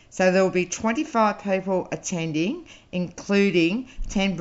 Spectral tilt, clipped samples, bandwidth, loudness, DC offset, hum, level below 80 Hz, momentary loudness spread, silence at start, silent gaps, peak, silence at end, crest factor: -5 dB/octave; under 0.1%; 8 kHz; -24 LUFS; under 0.1%; none; -42 dBFS; 11 LU; 0.15 s; none; -6 dBFS; 0 s; 18 dB